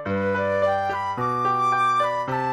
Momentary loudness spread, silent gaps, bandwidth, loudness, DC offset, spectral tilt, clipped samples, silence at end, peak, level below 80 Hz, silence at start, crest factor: 5 LU; none; 12.5 kHz; -22 LUFS; under 0.1%; -6 dB/octave; under 0.1%; 0 s; -12 dBFS; -62 dBFS; 0 s; 12 dB